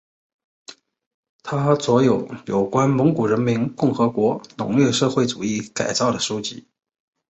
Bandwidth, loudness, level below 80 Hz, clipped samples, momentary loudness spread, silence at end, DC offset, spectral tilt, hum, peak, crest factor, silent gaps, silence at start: 8.2 kHz; -20 LUFS; -58 dBFS; under 0.1%; 9 LU; 0.7 s; under 0.1%; -5.5 dB/octave; none; -4 dBFS; 18 dB; 1.06-1.23 s, 1.29-1.39 s; 0.7 s